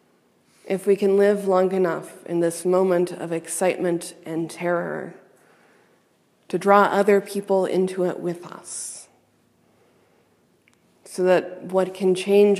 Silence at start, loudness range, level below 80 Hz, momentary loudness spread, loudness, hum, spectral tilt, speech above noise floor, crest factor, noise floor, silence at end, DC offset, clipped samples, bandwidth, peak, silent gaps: 0.65 s; 7 LU; -80 dBFS; 14 LU; -22 LUFS; none; -5.5 dB/octave; 42 dB; 22 dB; -63 dBFS; 0 s; under 0.1%; under 0.1%; 14 kHz; -2 dBFS; none